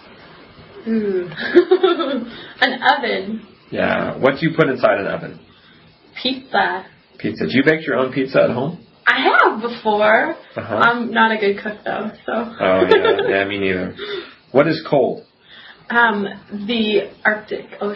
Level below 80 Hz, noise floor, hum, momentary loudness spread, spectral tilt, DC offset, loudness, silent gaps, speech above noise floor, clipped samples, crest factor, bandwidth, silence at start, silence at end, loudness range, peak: -58 dBFS; -48 dBFS; none; 14 LU; -7 dB/octave; under 0.1%; -17 LUFS; none; 31 dB; under 0.1%; 18 dB; 7 kHz; 0.25 s; 0 s; 4 LU; 0 dBFS